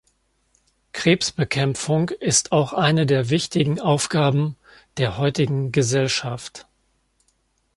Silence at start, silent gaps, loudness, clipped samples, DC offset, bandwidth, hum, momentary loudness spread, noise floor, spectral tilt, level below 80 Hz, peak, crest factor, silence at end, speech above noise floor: 0.95 s; none; -21 LUFS; under 0.1%; under 0.1%; 11.5 kHz; none; 8 LU; -67 dBFS; -4.5 dB/octave; -54 dBFS; -2 dBFS; 20 dB; 1.15 s; 46 dB